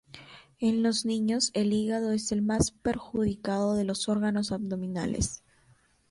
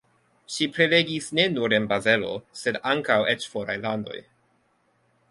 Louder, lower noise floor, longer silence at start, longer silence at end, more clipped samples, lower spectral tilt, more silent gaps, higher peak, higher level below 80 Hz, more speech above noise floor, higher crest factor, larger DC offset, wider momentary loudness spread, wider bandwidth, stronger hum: second, -29 LUFS vs -24 LUFS; about the same, -64 dBFS vs -67 dBFS; second, 0.15 s vs 0.5 s; second, 0.75 s vs 1.1 s; neither; about the same, -4.5 dB/octave vs -4 dB/octave; neither; second, -10 dBFS vs -4 dBFS; first, -48 dBFS vs -64 dBFS; second, 36 dB vs 43 dB; about the same, 18 dB vs 22 dB; neither; second, 6 LU vs 12 LU; about the same, 11.5 kHz vs 11.5 kHz; neither